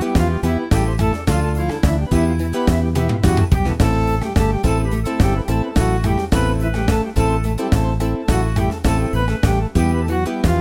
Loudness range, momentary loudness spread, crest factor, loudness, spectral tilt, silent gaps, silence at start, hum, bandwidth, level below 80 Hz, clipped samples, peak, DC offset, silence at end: 1 LU; 3 LU; 16 dB; -18 LUFS; -7 dB/octave; none; 0 s; none; 17 kHz; -22 dBFS; under 0.1%; -2 dBFS; under 0.1%; 0 s